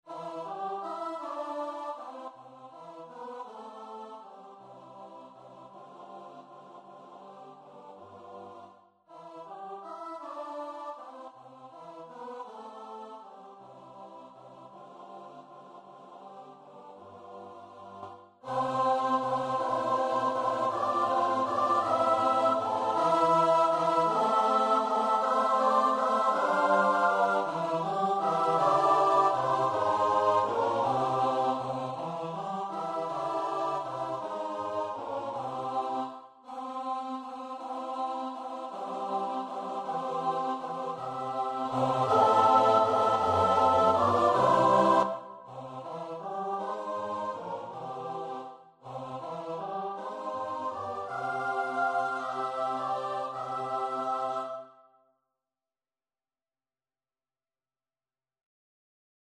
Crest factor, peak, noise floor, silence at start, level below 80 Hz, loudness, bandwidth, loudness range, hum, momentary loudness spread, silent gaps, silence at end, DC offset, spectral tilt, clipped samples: 20 dB; -10 dBFS; under -90 dBFS; 0.05 s; -72 dBFS; -29 LUFS; 12 kHz; 22 LU; none; 25 LU; none; 4.6 s; under 0.1%; -5.5 dB/octave; under 0.1%